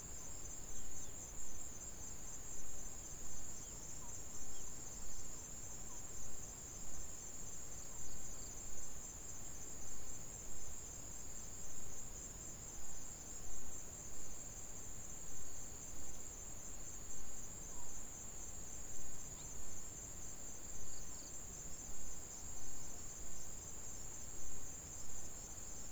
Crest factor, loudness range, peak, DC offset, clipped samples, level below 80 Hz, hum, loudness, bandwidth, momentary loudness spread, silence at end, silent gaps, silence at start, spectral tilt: 12 dB; 0 LU; -28 dBFS; under 0.1%; under 0.1%; -58 dBFS; none; -49 LUFS; over 20 kHz; 1 LU; 0 s; none; 0 s; -2.5 dB/octave